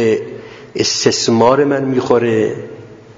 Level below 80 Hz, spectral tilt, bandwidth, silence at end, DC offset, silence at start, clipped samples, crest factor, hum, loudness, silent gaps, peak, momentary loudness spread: -54 dBFS; -4.5 dB/octave; 7.8 kHz; 0.2 s; under 0.1%; 0 s; under 0.1%; 14 dB; none; -14 LUFS; none; 0 dBFS; 17 LU